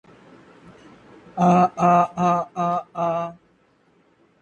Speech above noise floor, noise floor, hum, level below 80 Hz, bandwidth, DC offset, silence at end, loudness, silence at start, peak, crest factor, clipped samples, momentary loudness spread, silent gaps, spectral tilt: 41 dB; -60 dBFS; none; -62 dBFS; 8.2 kHz; under 0.1%; 1.1 s; -20 LUFS; 1.35 s; -4 dBFS; 20 dB; under 0.1%; 10 LU; none; -8 dB/octave